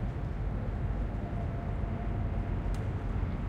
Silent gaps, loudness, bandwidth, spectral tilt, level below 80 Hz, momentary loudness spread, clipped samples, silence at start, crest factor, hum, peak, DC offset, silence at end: none; -35 LUFS; 6.6 kHz; -9 dB/octave; -36 dBFS; 1 LU; under 0.1%; 0 s; 12 dB; none; -20 dBFS; under 0.1%; 0 s